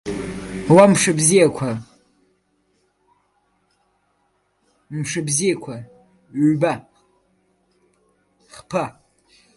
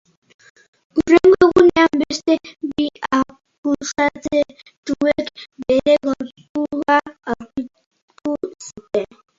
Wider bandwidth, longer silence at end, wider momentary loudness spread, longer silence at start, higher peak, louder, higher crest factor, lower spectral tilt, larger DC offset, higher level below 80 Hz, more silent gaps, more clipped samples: first, 12 kHz vs 7.8 kHz; first, 0.65 s vs 0.35 s; about the same, 19 LU vs 17 LU; second, 0.05 s vs 0.95 s; about the same, 0 dBFS vs 0 dBFS; about the same, -18 LUFS vs -18 LUFS; about the same, 20 dB vs 18 dB; about the same, -5 dB/octave vs -4.5 dB/octave; neither; about the same, -54 dBFS vs -50 dBFS; second, none vs 3.58-3.63 s, 4.77-4.83 s, 6.49-6.55 s, 7.86-7.91 s, 8.02-8.08 s; neither